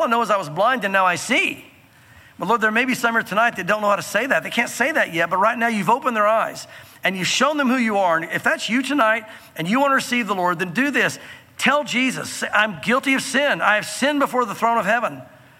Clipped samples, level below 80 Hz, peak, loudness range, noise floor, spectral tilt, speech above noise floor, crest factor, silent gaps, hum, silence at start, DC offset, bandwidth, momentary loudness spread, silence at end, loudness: under 0.1%; -68 dBFS; -4 dBFS; 1 LU; -49 dBFS; -3.5 dB/octave; 29 dB; 16 dB; none; none; 0 s; under 0.1%; 17 kHz; 6 LU; 0.3 s; -19 LUFS